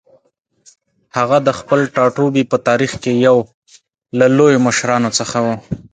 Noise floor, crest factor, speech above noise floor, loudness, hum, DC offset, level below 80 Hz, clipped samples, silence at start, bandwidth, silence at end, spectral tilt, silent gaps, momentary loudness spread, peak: -61 dBFS; 16 dB; 47 dB; -14 LUFS; none; under 0.1%; -50 dBFS; under 0.1%; 1.15 s; 9.6 kHz; 0.1 s; -5 dB/octave; 3.54-3.62 s; 9 LU; 0 dBFS